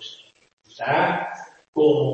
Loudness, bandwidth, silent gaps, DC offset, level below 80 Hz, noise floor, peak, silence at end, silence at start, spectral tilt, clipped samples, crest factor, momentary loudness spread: -22 LUFS; 7.2 kHz; 0.53-0.57 s, 1.68-1.73 s; under 0.1%; -70 dBFS; -43 dBFS; -6 dBFS; 0 s; 0 s; -6.5 dB/octave; under 0.1%; 16 dB; 18 LU